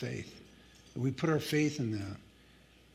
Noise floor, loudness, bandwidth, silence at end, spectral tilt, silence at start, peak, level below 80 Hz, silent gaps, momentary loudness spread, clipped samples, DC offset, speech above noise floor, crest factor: -61 dBFS; -34 LUFS; 16 kHz; 0.7 s; -6 dB/octave; 0 s; -18 dBFS; -66 dBFS; none; 19 LU; under 0.1%; under 0.1%; 27 dB; 18 dB